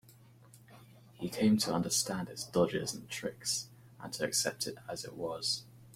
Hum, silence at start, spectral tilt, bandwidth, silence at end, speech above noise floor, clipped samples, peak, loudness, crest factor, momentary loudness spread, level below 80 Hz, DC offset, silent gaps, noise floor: none; 0.1 s; -3.5 dB/octave; 16.5 kHz; 0 s; 25 dB; under 0.1%; -16 dBFS; -34 LUFS; 20 dB; 13 LU; -66 dBFS; under 0.1%; none; -59 dBFS